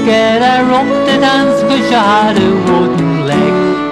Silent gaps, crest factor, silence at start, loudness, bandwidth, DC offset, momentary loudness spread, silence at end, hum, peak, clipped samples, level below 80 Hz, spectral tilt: none; 8 dB; 0 s; -10 LUFS; 12.5 kHz; under 0.1%; 3 LU; 0 s; none; -2 dBFS; under 0.1%; -42 dBFS; -5.5 dB/octave